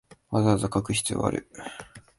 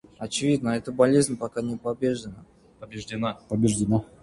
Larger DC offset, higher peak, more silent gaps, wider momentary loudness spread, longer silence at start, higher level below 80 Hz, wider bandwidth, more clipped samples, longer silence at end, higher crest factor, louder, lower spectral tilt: neither; about the same, -8 dBFS vs -6 dBFS; neither; first, 17 LU vs 14 LU; about the same, 0.3 s vs 0.2 s; about the same, -50 dBFS vs -54 dBFS; about the same, 11.5 kHz vs 11.5 kHz; neither; about the same, 0.2 s vs 0.2 s; about the same, 20 dB vs 20 dB; about the same, -26 LUFS vs -25 LUFS; about the same, -5 dB/octave vs -5.5 dB/octave